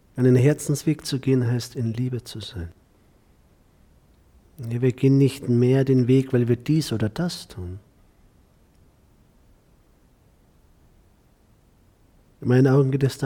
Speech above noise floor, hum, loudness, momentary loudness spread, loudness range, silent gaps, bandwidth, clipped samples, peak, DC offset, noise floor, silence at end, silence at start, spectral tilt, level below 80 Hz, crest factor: 37 dB; none; -22 LUFS; 17 LU; 12 LU; none; 15.5 kHz; under 0.1%; -8 dBFS; under 0.1%; -58 dBFS; 0 s; 0.15 s; -7.5 dB/octave; -54 dBFS; 16 dB